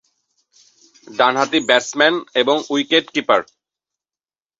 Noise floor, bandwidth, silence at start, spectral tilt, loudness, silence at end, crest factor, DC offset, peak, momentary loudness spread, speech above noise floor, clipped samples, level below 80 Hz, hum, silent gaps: under -90 dBFS; 8 kHz; 1.1 s; -2.5 dB/octave; -16 LUFS; 1.15 s; 18 dB; under 0.1%; -2 dBFS; 4 LU; over 73 dB; under 0.1%; -64 dBFS; none; none